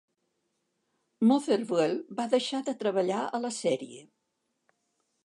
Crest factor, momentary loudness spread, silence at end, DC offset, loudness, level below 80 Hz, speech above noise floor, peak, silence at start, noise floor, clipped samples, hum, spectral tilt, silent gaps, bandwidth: 18 dB; 7 LU; 1.2 s; under 0.1%; -29 LUFS; -86 dBFS; 52 dB; -12 dBFS; 1.2 s; -80 dBFS; under 0.1%; none; -5 dB/octave; none; 11.5 kHz